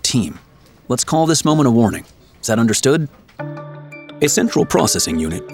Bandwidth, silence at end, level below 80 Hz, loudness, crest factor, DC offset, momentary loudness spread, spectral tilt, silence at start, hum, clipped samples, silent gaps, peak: 17 kHz; 0 s; -46 dBFS; -16 LUFS; 16 dB; under 0.1%; 17 LU; -4.5 dB/octave; 0.05 s; none; under 0.1%; none; 0 dBFS